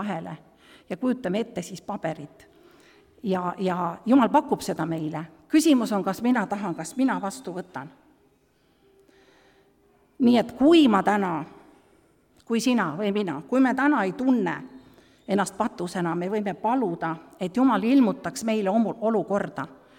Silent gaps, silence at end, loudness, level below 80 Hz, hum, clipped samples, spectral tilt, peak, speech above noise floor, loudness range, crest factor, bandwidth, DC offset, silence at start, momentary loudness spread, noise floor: none; 0.25 s; -24 LUFS; -64 dBFS; none; under 0.1%; -5.5 dB/octave; -6 dBFS; 40 dB; 7 LU; 18 dB; 16.5 kHz; under 0.1%; 0 s; 15 LU; -64 dBFS